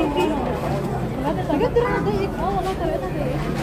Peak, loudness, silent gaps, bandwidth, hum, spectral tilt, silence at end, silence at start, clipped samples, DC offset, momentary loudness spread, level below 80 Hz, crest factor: -8 dBFS; -23 LUFS; none; 15.5 kHz; none; -7 dB/octave; 0 s; 0 s; under 0.1%; under 0.1%; 5 LU; -34 dBFS; 14 dB